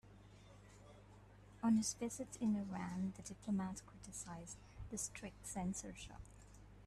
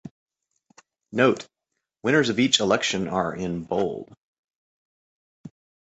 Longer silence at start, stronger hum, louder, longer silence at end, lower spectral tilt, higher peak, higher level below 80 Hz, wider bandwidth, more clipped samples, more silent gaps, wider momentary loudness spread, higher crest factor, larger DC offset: about the same, 0.05 s vs 0.05 s; first, 50 Hz at -60 dBFS vs none; second, -44 LUFS vs -23 LUFS; second, 0 s vs 0.45 s; about the same, -5 dB/octave vs -4 dB/octave; second, -26 dBFS vs -4 dBFS; second, -64 dBFS vs -58 dBFS; first, 13.5 kHz vs 8.4 kHz; neither; second, none vs 0.11-0.26 s, 4.17-4.48 s, 4.55-5.44 s; first, 24 LU vs 12 LU; second, 18 dB vs 24 dB; neither